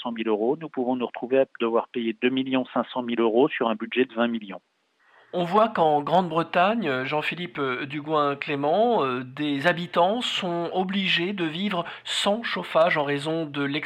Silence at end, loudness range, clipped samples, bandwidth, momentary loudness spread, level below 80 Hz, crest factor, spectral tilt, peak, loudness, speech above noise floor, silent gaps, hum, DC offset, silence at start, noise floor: 0 s; 1 LU; under 0.1%; 14.5 kHz; 7 LU; -74 dBFS; 16 dB; -5.5 dB/octave; -8 dBFS; -24 LUFS; 36 dB; none; none; under 0.1%; 0 s; -60 dBFS